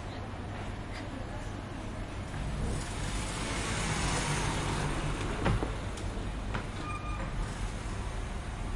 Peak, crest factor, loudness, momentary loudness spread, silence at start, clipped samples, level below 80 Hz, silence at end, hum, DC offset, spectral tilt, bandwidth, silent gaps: -16 dBFS; 18 dB; -35 LUFS; 9 LU; 0 s; under 0.1%; -38 dBFS; 0 s; none; under 0.1%; -4.5 dB/octave; 11.5 kHz; none